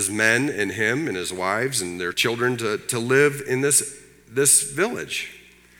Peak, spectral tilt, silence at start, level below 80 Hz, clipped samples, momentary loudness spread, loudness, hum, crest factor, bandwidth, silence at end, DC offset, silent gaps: -2 dBFS; -2.5 dB/octave; 0 s; -62 dBFS; under 0.1%; 11 LU; -21 LUFS; none; 20 dB; 18.5 kHz; 0.4 s; under 0.1%; none